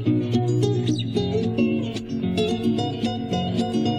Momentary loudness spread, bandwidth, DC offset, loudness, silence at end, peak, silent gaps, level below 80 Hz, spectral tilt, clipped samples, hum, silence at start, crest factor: 4 LU; 10 kHz; under 0.1%; -23 LUFS; 0 s; -10 dBFS; none; -50 dBFS; -7 dB/octave; under 0.1%; none; 0 s; 14 dB